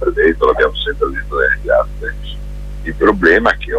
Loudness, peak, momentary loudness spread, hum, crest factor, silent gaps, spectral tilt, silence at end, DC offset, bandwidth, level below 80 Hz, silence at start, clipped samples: -14 LUFS; 0 dBFS; 17 LU; 50 Hz at -25 dBFS; 14 dB; none; -6.5 dB/octave; 0 s; under 0.1%; 11 kHz; -26 dBFS; 0 s; under 0.1%